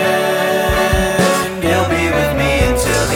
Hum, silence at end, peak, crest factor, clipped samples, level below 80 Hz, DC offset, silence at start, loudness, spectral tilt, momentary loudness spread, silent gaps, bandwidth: none; 0 s; -2 dBFS; 12 dB; under 0.1%; -26 dBFS; under 0.1%; 0 s; -14 LUFS; -4.5 dB/octave; 2 LU; none; 17.5 kHz